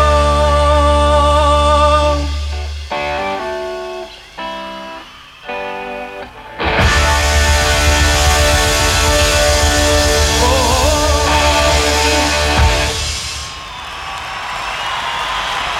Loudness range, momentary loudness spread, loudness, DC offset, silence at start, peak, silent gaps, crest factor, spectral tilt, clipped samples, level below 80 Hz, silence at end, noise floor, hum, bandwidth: 12 LU; 15 LU; -13 LUFS; under 0.1%; 0 s; 0 dBFS; none; 14 dB; -3.5 dB/octave; under 0.1%; -20 dBFS; 0 s; -35 dBFS; none; 16 kHz